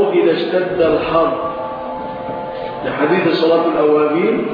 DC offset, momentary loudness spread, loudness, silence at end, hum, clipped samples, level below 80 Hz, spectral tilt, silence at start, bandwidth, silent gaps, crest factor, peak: under 0.1%; 11 LU; -16 LUFS; 0 s; none; under 0.1%; -48 dBFS; -8.5 dB/octave; 0 s; 5.2 kHz; none; 12 dB; -2 dBFS